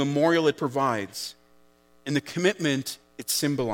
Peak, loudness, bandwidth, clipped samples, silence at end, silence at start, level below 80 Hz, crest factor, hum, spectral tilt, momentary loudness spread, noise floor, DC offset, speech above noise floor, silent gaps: -10 dBFS; -26 LUFS; 17.5 kHz; under 0.1%; 0 s; 0 s; -70 dBFS; 18 dB; none; -4.5 dB/octave; 14 LU; -59 dBFS; under 0.1%; 34 dB; none